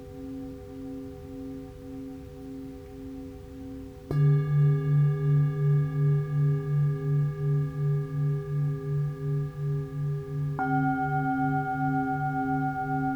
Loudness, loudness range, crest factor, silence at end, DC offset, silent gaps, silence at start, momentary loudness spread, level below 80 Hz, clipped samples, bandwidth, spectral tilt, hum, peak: -27 LUFS; 15 LU; 12 dB; 0 s; under 0.1%; none; 0 s; 17 LU; -52 dBFS; under 0.1%; 3.7 kHz; -10 dB/octave; none; -16 dBFS